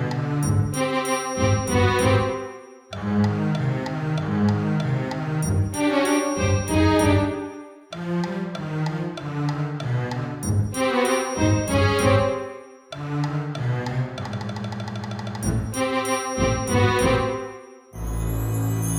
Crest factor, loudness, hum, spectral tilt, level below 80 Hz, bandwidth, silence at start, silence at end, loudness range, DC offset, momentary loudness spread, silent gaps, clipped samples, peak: 18 dB; -23 LUFS; none; -6 dB/octave; -40 dBFS; 18 kHz; 0 s; 0 s; 5 LU; under 0.1%; 12 LU; none; under 0.1%; -6 dBFS